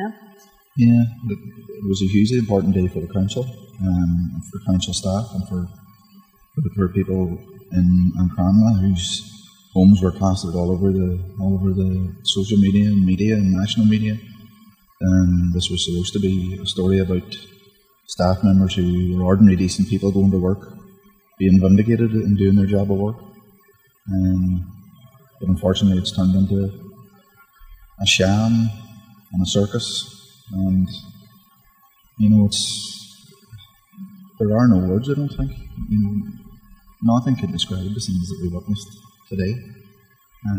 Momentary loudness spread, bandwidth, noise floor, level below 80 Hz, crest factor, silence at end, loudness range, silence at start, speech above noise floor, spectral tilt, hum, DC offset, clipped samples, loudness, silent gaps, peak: 13 LU; 15.5 kHz; -56 dBFS; -42 dBFS; 18 dB; 0 s; 6 LU; 0 s; 38 dB; -6.5 dB/octave; none; under 0.1%; under 0.1%; -19 LUFS; none; 0 dBFS